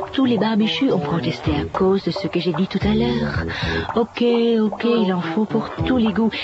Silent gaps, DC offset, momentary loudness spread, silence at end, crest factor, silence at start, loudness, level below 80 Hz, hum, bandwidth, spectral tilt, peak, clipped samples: none; under 0.1%; 5 LU; 0 s; 14 dB; 0 s; -20 LUFS; -40 dBFS; none; 7.8 kHz; -7.5 dB/octave; -6 dBFS; under 0.1%